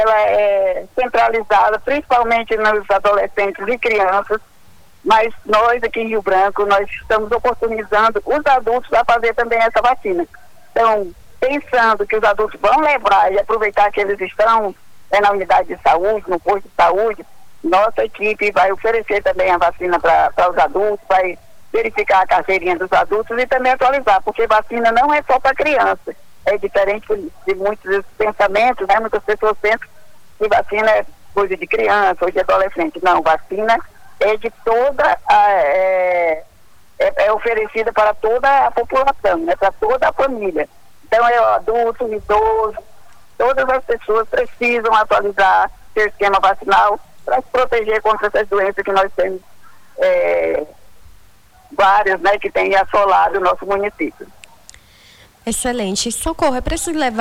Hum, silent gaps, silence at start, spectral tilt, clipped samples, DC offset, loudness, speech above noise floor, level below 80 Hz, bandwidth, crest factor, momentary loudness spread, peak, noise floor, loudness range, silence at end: none; none; 0 s; -3.5 dB/octave; under 0.1%; under 0.1%; -16 LUFS; 34 dB; -42 dBFS; 19 kHz; 14 dB; 7 LU; -2 dBFS; -49 dBFS; 3 LU; 0 s